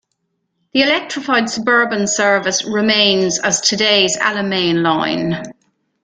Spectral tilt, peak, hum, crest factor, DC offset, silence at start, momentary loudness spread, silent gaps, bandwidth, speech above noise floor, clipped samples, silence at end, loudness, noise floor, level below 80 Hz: -2.5 dB/octave; 0 dBFS; none; 16 dB; under 0.1%; 0.75 s; 6 LU; none; 10 kHz; 55 dB; under 0.1%; 0.5 s; -15 LUFS; -70 dBFS; -58 dBFS